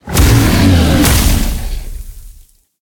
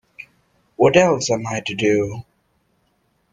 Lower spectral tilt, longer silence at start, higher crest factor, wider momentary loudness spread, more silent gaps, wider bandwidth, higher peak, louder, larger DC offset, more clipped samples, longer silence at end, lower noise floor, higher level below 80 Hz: about the same, -5 dB/octave vs -4.5 dB/octave; second, 0.05 s vs 0.2 s; second, 12 dB vs 20 dB; second, 18 LU vs 23 LU; neither; first, 18.5 kHz vs 9.8 kHz; about the same, 0 dBFS vs 0 dBFS; first, -10 LUFS vs -18 LUFS; neither; neither; second, 0.55 s vs 1.1 s; second, -41 dBFS vs -65 dBFS; first, -18 dBFS vs -54 dBFS